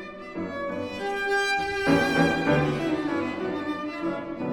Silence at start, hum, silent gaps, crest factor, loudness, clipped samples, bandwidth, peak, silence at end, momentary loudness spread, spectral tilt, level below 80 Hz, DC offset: 0 s; none; none; 18 dB; -26 LUFS; under 0.1%; 18 kHz; -8 dBFS; 0 s; 10 LU; -5.5 dB/octave; -54 dBFS; under 0.1%